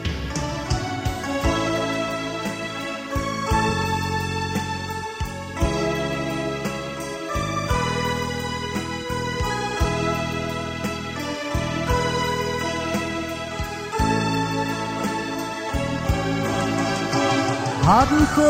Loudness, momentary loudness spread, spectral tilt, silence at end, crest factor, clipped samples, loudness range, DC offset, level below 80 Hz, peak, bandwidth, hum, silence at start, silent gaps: -24 LUFS; 7 LU; -5 dB/octave; 0 s; 20 dB; under 0.1%; 2 LU; under 0.1%; -36 dBFS; -4 dBFS; 16 kHz; none; 0 s; none